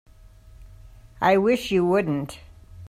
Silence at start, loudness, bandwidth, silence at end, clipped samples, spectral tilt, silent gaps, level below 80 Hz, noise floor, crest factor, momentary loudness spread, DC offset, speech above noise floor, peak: 0.45 s; -22 LUFS; 15.5 kHz; 0 s; under 0.1%; -6.5 dB/octave; none; -48 dBFS; -48 dBFS; 18 dB; 14 LU; under 0.1%; 27 dB; -8 dBFS